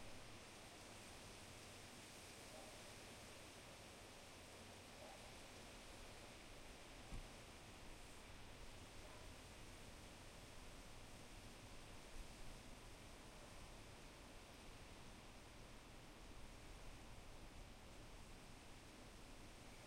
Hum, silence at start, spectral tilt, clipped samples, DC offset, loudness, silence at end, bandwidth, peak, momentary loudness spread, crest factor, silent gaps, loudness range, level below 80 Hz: none; 0 s; -3.5 dB/octave; under 0.1%; under 0.1%; -59 LUFS; 0 s; 16 kHz; -40 dBFS; 3 LU; 18 dB; none; 3 LU; -64 dBFS